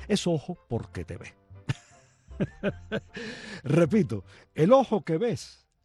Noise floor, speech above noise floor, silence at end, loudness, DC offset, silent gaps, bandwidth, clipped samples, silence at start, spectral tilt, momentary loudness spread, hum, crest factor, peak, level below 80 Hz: -58 dBFS; 31 dB; 0.35 s; -28 LUFS; under 0.1%; none; 12 kHz; under 0.1%; 0 s; -6.5 dB/octave; 19 LU; none; 20 dB; -8 dBFS; -54 dBFS